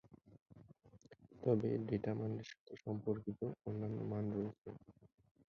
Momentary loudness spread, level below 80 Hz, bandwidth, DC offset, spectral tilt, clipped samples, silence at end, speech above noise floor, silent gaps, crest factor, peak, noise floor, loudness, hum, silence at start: 15 LU; -70 dBFS; 7 kHz; under 0.1%; -9 dB/octave; under 0.1%; 0.45 s; 24 dB; 0.41-0.46 s, 2.60-2.66 s, 4.58-4.62 s; 22 dB; -22 dBFS; -65 dBFS; -42 LUFS; none; 0.05 s